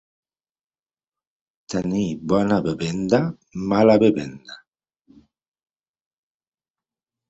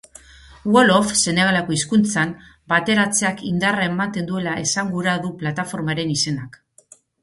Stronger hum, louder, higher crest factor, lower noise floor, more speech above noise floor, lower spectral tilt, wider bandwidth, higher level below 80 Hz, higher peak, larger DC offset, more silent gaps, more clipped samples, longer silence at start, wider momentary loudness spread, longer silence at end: neither; about the same, -21 LUFS vs -19 LUFS; about the same, 20 dB vs 20 dB; first, under -90 dBFS vs -51 dBFS; first, over 70 dB vs 32 dB; first, -7 dB/octave vs -4 dB/octave; second, 8.2 kHz vs 11.5 kHz; about the same, -54 dBFS vs -52 dBFS; about the same, -2 dBFS vs -2 dBFS; neither; neither; neither; first, 1.7 s vs 0.5 s; first, 15 LU vs 10 LU; first, 2.75 s vs 0.75 s